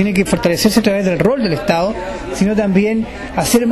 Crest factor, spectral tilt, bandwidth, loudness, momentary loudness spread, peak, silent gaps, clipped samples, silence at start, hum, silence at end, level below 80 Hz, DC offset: 14 dB; -5 dB/octave; 13 kHz; -15 LUFS; 7 LU; -2 dBFS; none; under 0.1%; 0 s; none; 0 s; -36 dBFS; under 0.1%